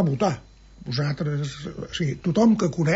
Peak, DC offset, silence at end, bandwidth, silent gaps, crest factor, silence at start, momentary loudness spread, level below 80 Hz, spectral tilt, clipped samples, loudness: -8 dBFS; under 0.1%; 0 s; 8 kHz; none; 14 dB; 0 s; 14 LU; -50 dBFS; -6.5 dB/octave; under 0.1%; -24 LUFS